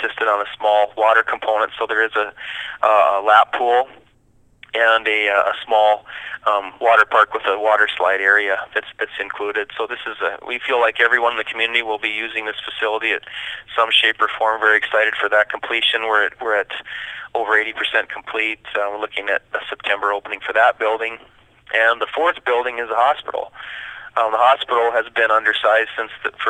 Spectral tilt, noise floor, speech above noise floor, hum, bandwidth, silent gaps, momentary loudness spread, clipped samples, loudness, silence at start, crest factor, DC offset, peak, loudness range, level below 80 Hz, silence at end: -2 dB/octave; -55 dBFS; 37 dB; none; 10.5 kHz; none; 11 LU; under 0.1%; -18 LUFS; 0 s; 18 dB; under 0.1%; 0 dBFS; 4 LU; -62 dBFS; 0 s